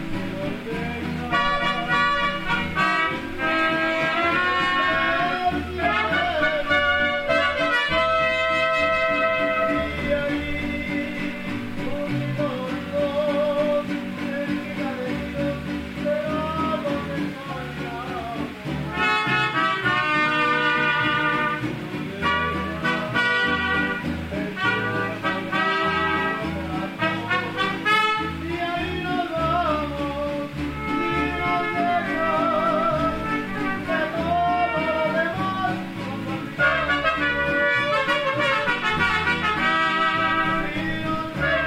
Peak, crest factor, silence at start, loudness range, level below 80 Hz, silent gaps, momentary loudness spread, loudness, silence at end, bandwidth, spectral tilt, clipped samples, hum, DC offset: -8 dBFS; 16 dB; 0 s; 5 LU; -44 dBFS; none; 9 LU; -23 LUFS; 0 s; 16 kHz; -5.5 dB/octave; under 0.1%; none; under 0.1%